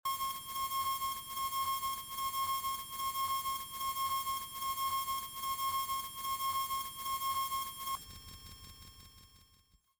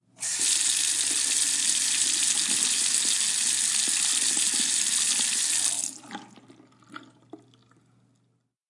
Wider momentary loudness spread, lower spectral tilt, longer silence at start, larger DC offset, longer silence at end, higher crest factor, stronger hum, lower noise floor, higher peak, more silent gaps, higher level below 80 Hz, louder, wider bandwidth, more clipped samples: first, 15 LU vs 4 LU; first, 0 dB/octave vs 2.5 dB/octave; second, 0.05 s vs 0.2 s; neither; second, 0.55 s vs 1.35 s; second, 12 dB vs 22 dB; neither; about the same, -69 dBFS vs -71 dBFS; second, -26 dBFS vs -6 dBFS; neither; first, -62 dBFS vs -88 dBFS; second, -36 LUFS vs -22 LUFS; first, over 20 kHz vs 12 kHz; neither